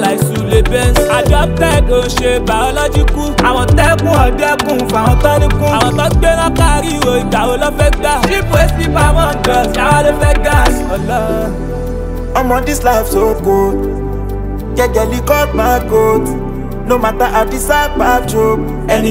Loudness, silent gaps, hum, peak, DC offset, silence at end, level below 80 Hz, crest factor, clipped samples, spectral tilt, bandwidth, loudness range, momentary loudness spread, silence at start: -12 LUFS; none; none; 0 dBFS; under 0.1%; 0 s; -18 dBFS; 12 dB; under 0.1%; -5.5 dB/octave; 16.5 kHz; 3 LU; 7 LU; 0 s